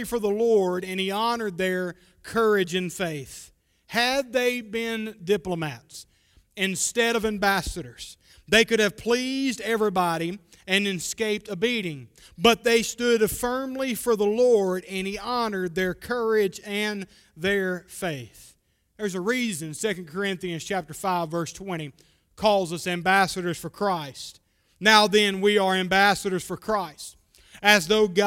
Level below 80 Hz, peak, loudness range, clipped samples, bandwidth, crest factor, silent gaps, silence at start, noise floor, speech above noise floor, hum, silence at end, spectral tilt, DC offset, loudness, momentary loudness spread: -54 dBFS; 0 dBFS; 7 LU; under 0.1%; 16.5 kHz; 24 dB; none; 0 s; -63 dBFS; 38 dB; none; 0 s; -3.5 dB/octave; under 0.1%; -24 LUFS; 15 LU